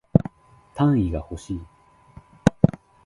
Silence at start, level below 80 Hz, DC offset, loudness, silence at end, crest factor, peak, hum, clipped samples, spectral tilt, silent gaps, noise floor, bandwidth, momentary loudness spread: 0.15 s; -40 dBFS; under 0.1%; -23 LUFS; 0.4 s; 24 dB; 0 dBFS; none; under 0.1%; -8.5 dB/octave; none; -52 dBFS; 11.5 kHz; 14 LU